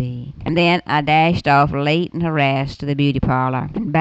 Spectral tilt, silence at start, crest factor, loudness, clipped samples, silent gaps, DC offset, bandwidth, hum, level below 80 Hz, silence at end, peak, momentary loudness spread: -7.5 dB/octave; 0 s; 12 dB; -17 LUFS; under 0.1%; none; under 0.1%; 8 kHz; none; -40 dBFS; 0 s; -4 dBFS; 8 LU